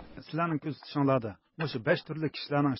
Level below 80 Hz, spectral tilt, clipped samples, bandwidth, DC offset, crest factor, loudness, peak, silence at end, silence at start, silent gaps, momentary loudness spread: -64 dBFS; -10.5 dB/octave; under 0.1%; 5.8 kHz; under 0.1%; 18 dB; -31 LUFS; -12 dBFS; 0 s; 0 s; none; 9 LU